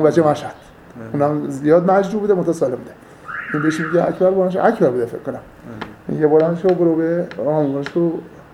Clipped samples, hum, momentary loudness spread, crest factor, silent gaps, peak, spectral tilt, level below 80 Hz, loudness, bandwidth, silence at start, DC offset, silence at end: under 0.1%; none; 16 LU; 18 dB; none; 0 dBFS; -7.5 dB/octave; -54 dBFS; -17 LUFS; 12.5 kHz; 0 s; under 0.1%; 0.1 s